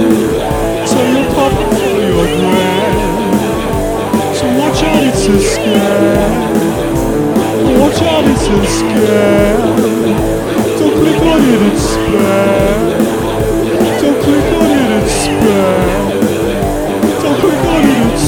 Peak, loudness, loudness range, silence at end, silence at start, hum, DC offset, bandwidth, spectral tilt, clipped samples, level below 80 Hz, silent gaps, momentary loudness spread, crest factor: 0 dBFS; -11 LUFS; 1 LU; 0 s; 0 s; none; under 0.1%; 19 kHz; -5.5 dB/octave; 0.2%; -26 dBFS; none; 4 LU; 10 dB